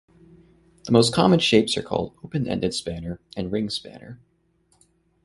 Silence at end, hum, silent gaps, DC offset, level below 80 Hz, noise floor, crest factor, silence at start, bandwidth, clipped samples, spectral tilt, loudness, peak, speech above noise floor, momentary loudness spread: 1.1 s; none; none; under 0.1%; -50 dBFS; -65 dBFS; 22 dB; 0.85 s; 11.5 kHz; under 0.1%; -5 dB/octave; -22 LUFS; -2 dBFS; 42 dB; 16 LU